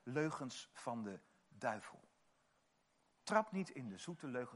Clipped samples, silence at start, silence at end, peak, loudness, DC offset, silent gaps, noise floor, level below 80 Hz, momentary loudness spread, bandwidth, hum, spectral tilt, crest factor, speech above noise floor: under 0.1%; 0.05 s; 0 s; -20 dBFS; -44 LUFS; under 0.1%; none; -79 dBFS; -90 dBFS; 13 LU; 11.5 kHz; none; -5 dB/octave; 26 dB; 35 dB